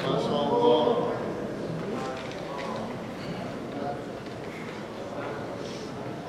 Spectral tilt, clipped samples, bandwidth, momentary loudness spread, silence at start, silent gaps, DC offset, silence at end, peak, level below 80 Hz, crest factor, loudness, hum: -6 dB/octave; under 0.1%; 13.5 kHz; 14 LU; 0 s; none; under 0.1%; 0 s; -10 dBFS; -58 dBFS; 20 dB; -30 LUFS; none